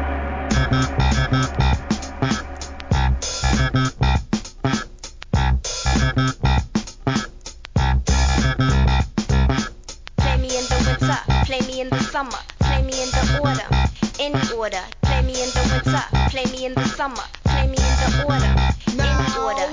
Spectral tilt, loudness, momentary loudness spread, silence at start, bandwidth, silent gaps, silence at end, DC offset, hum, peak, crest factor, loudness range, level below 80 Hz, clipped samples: -5 dB/octave; -21 LUFS; 7 LU; 0 s; 7.6 kHz; none; 0 s; 0.2%; none; -6 dBFS; 14 dB; 2 LU; -24 dBFS; under 0.1%